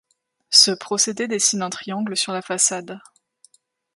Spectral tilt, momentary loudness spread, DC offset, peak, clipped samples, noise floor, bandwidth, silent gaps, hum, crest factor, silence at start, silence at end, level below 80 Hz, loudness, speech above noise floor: -1 dB/octave; 15 LU; under 0.1%; 0 dBFS; under 0.1%; -62 dBFS; 12 kHz; none; none; 22 dB; 0.5 s; 0.95 s; -74 dBFS; -18 LUFS; 39 dB